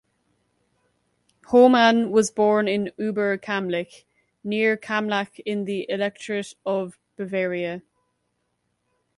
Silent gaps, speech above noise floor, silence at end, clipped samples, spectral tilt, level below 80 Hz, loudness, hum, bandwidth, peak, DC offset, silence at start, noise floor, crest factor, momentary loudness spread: none; 52 dB; 1.4 s; under 0.1%; -5 dB/octave; -68 dBFS; -22 LUFS; 60 Hz at -55 dBFS; 11.5 kHz; -4 dBFS; under 0.1%; 1.5 s; -74 dBFS; 20 dB; 13 LU